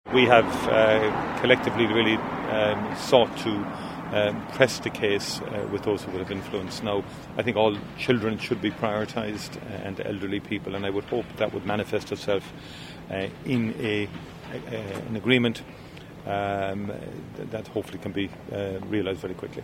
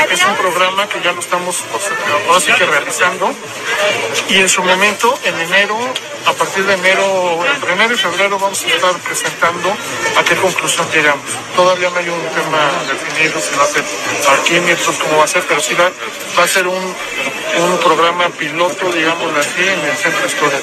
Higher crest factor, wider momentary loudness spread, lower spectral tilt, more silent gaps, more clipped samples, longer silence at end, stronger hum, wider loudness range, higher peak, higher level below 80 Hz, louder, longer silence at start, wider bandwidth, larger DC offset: first, 26 dB vs 14 dB; first, 14 LU vs 7 LU; first, -5.5 dB/octave vs -2 dB/octave; neither; neither; about the same, 0 s vs 0 s; neither; first, 7 LU vs 2 LU; about the same, 0 dBFS vs 0 dBFS; about the same, -54 dBFS vs -58 dBFS; second, -26 LUFS vs -13 LUFS; about the same, 0.05 s vs 0 s; first, 16 kHz vs 14 kHz; neither